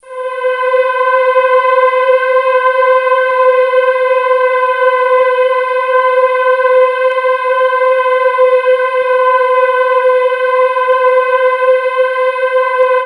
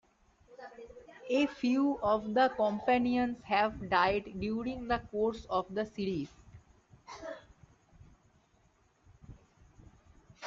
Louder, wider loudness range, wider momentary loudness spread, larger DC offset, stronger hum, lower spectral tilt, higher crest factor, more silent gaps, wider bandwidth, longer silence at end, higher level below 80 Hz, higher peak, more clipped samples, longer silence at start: first, -11 LUFS vs -32 LUFS; second, 1 LU vs 23 LU; second, 3 LU vs 21 LU; neither; neither; second, 0 dB/octave vs -6 dB/octave; second, 10 dB vs 20 dB; neither; first, 10.5 kHz vs 7.6 kHz; about the same, 0 s vs 0 s; second, -72 dBFS vs -60 dBFS; first, 0 dBFS vs -14 dBFS; neither; second, 0.05 s vs 0.5 s